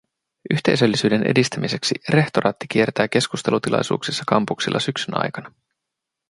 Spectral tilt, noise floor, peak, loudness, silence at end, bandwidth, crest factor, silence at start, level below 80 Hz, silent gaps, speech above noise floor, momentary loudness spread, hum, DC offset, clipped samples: -5 dB/octave; -83 dBFS; -2 dBFS; -20 LUFS; 0.8 s; 11.5 kHz; 20 dB; 0.45 s; -58 dBFS; none; 62 dB; 6 LU; none; under 0.1%; under 0.1%